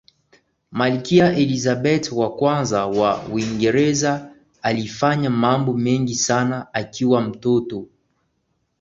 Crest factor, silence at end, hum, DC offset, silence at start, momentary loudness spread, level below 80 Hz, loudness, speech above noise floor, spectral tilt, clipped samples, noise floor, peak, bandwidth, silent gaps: 18 dB; 0.95 s; none; under 0.1%; 0.7 s; 7 LU; -54 dBFS; -19 LUFS; 51 dB; -5 dB/octave; under 0.1%; -70 dBFS; -2 dBFS; 8 kHz; none